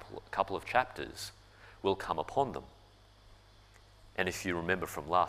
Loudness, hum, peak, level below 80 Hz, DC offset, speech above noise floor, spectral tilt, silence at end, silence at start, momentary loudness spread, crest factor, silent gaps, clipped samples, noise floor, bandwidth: -35 LUFS; 50 Hz at -60 dBFS; -12 dBFS; -60 dBFS; under 0.1%; 26 dB; -4.5 dB/octave; 0 s; 0 s; 11 LU; 24 dB; none; under 0.1%; -60 dBFS; 15.5 kHz